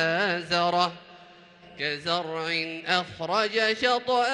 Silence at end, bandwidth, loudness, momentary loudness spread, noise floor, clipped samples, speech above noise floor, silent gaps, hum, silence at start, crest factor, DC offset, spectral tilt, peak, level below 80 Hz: 0 s; 10.5 kHz; -26 LUFS; 6 LU; -51 dBFS; under 0.1%; 25 dB; none; none; 0 s; 18 dB; under 0.1%; -3.5 dB/octave; -8 dBFS; -68 dBFS